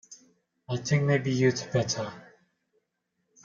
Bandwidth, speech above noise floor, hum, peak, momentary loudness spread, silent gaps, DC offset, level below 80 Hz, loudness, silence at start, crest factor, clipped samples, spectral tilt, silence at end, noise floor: 7.6 kHz; 53 dB; none; -10 dBFS; 10 LU; none; under 0.1%; -66 dBFS; -27 LUFS; 0.1 s; 20 dB; under 0.1%; -5.5 dB/octave; 1.2 s; -79 dBFS